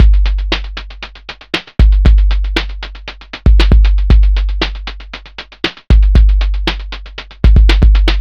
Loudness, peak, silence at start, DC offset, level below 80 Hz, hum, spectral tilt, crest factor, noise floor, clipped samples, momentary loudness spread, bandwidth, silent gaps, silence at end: -13 LUFS; 0 dBFS; 0 s; 0.4%; -10 dBFS; none; -6.5 dB/octave; 10 dB; -31 dBFS; 0.6%; 19 LU; 6.2 kHz; none; 0 s